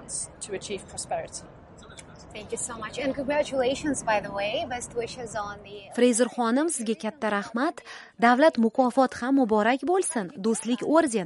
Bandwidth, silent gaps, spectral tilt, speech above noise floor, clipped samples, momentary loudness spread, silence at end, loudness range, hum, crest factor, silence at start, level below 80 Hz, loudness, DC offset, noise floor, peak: 11.5 kHz; none; -3.5 dB/octave; 21 dB; under 0.1%; 16 LU; 0 s; 7 LU; none; 20 dB; 0 s; -58 dBFS; -26 LUFS; under 0.1%; -47 dBFS; -6 dBFS